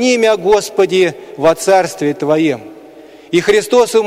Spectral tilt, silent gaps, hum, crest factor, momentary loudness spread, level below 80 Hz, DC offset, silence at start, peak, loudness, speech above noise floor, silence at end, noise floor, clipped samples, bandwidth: -4 dB/octave; none; none; 12 dB; 6 LU; -50 dBFS; under 0.1%; 0 s; -2 dBFS; -13 LUFS; 25 dB; 0 s; -37 dBFS; under 0.1%; 16 kHz